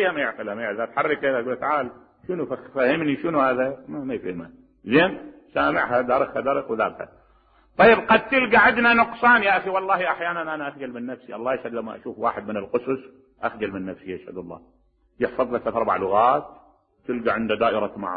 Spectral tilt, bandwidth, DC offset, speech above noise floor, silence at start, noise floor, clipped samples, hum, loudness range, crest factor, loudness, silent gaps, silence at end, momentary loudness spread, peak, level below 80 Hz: -9.5 dB/octave; 5 kHz; under 0.1%; 36 dB; 0 s; -58 dBFS; under 0.1%; none; 11 LU; 20 dB; -22 LUFS; none; 0 s; 17 LU; -4 dBFS; -56 dBFS